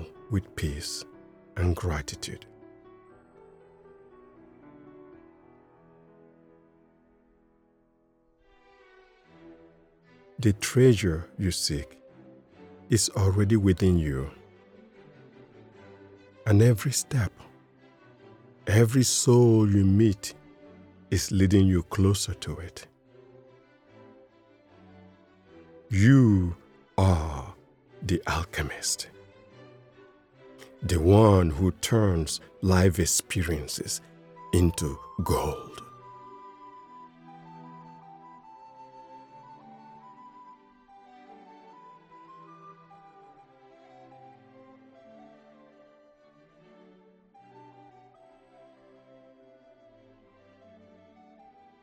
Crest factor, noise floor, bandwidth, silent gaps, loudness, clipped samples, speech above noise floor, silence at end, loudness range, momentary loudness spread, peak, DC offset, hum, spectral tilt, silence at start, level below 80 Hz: 24 dB; -66 dBFS; 17 kHz; none; -25 LUFS; under 0.1%; 43 dB; 9.1 s; 13 LU; 27 LU; -4 dBFS; under 0.1%; none; -5.5 dB/octave; 0 s; -46 dBFS